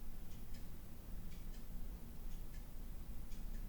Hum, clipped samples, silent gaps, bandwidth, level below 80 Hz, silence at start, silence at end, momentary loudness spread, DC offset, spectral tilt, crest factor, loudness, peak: none; under 0.1%; none; 19.5 kHz; -48 dBFS; 0 s; 0 s; 2 LU; under 0.1%; -5.5 dB/octave; 10 dB; -54 LUFS; -34 dBFS